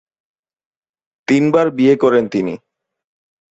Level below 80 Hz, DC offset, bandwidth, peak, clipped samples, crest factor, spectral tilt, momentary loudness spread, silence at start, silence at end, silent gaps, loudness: -62 dBFS; under 0.1%; 8.2 kHz; -2 dBFS; under 0.1%; 16 dB; -7 dB/octave; 14 LU; 1.3 s; 0.95 s; none; -15 LUFS